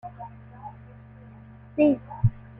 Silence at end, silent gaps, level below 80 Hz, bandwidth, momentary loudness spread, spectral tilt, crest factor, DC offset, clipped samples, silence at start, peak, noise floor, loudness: 0.3 s; none; -46 dBFS; 3.8 kHz; 25 LU; -12 dB/octave; 20 dB; under 0.1%; under 0.1%; 0.05 s; -10 dBFS; -47 dBFS; -25 LUFS